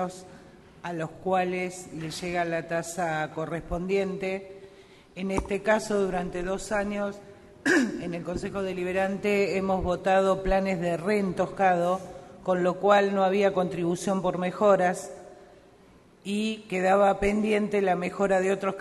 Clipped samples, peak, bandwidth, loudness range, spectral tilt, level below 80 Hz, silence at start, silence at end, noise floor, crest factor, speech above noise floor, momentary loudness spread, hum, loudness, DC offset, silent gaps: under 0.1%; -8 dBFS; 12.5 kHz; 6 LU; -5.5 dB/octave; -48 dBFS; 0 s; 0 s; -55 dBFS; 20 dB; 29 dB; 12 LU; none; -27 LUFS; under 0.1%; none